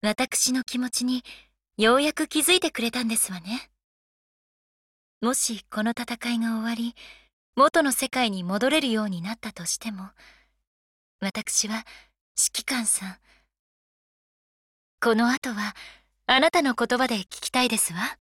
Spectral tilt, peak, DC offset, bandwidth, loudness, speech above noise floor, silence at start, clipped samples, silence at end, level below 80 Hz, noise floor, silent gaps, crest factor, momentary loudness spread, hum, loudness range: -2 dB/octave; -6 dBFS; under 0.1%; 17 kHz; -24 LUFS; over 65 dB; 0.05 s; under 0.1%; 0.1 s; -62 dBFS; under -90 dBFS; 3.84-5.21 s, 7.33-7.53 s, 10.67-11.19 s, 12.21-12.35 s, 13.59-14.98 s, 15.37-15.42 s; 20 dB; 13 LU; none; 6 LU